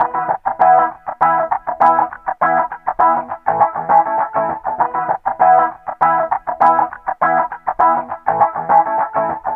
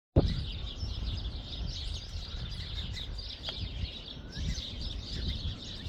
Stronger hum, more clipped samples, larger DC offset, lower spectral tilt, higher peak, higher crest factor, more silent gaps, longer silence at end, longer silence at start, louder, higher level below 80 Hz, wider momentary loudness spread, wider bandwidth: neither; neither; neither; first, -8 dB/octave vs -5.5 dB/octave; first, 0 dBFS vs -10 dBFS; second, 14 dB vs 26 dB; neither; about the same, 0 s vs 0 s; second, 0 s vs 0.15 s; first, -16 LUFS vs -37 LUFS; second, -54 dBFS vs -40 dBFS; first, 8 LU vs 4 LU; second, 3.9 kHz vs 10 kHz